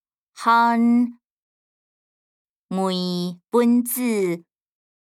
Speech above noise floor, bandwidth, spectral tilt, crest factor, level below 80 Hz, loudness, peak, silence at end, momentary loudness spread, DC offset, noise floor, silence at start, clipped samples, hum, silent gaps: over 70 dB; 16 kHz; -5.5 dB/octave; 18 dB; -82 dBFS; -21 LUFS; -6 dBFS; 0.7 s; 10 LU; under 0.1%; under -90 dBFS; 0.35 s; under 0.1%; none; 1.31-2.68 s